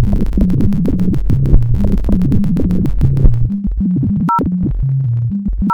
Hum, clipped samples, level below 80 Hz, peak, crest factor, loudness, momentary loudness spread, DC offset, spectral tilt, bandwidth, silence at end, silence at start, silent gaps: none; under 0.1%; -16 dBFS; -2 dBFS; 10 dB; -15 LUFS; 3 LU; 3%; -10.5 dB/octave; 5.2 kHz; 0 s; 0 s; none